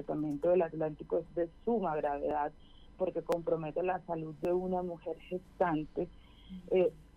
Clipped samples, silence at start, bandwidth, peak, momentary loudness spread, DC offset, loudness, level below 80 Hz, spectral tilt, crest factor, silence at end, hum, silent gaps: under 0.1%; 0 s; 11.5 kHz; -18 dBFS; 10 LU; under 0.1%; -35 LUFS; -58 dBFS; -8.5 dB/octave; 16 dB; 0.15 s; none; none